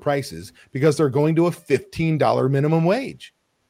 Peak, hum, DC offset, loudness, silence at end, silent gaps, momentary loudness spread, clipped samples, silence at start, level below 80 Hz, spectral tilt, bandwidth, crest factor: -4 dBFS; none; under 0.1%; -20 LUFS; 0.4 s; none; 15 LU; under 0.1%; 0 s; -54 dBFS; -7 dB/octave; 15.5 kHz; 16 dB